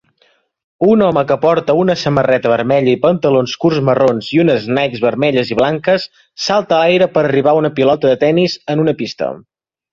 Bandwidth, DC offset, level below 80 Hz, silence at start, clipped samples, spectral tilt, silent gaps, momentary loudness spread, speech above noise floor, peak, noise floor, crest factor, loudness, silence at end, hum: 7.4 kHz; under 0.1%; -52 dBFS; 0.8 s; under 0.1%; -6.5 dB/octave; none; 5 LU; 44 dB; 0 dBFS; -57 dBFS; 12 dB; -13 LUFS; 0.55 s; none